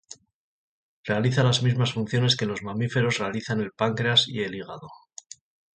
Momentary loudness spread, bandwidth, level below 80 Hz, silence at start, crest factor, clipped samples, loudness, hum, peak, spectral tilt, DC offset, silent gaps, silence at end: 20 LU; 9 kHz; -60 dBFS; 0.1 s; 20 dB; under 0.1%; -24 LUFS; none; -8 dBFS; -5 dB/octave; under 0.1%; 0.34-1.04 s; 0.75 s